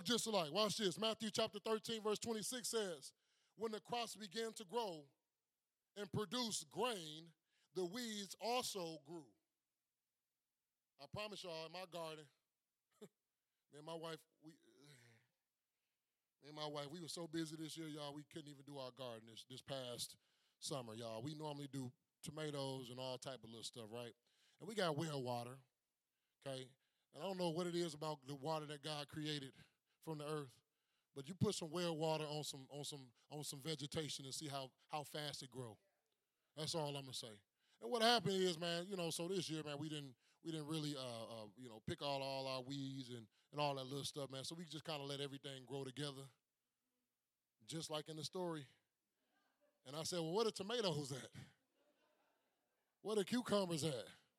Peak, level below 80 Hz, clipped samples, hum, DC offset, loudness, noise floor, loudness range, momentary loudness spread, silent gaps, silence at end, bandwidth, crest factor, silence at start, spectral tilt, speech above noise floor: -20 dBFS; -86 dBFS; under 0.1%; none; under 0.1%; -46 LUFS; under -90 dBFS; 12 LU; 15 LU; none; 0.2 s; 16 kHz; 28 dB; 0 s; -4 dB/octave; over 44 dB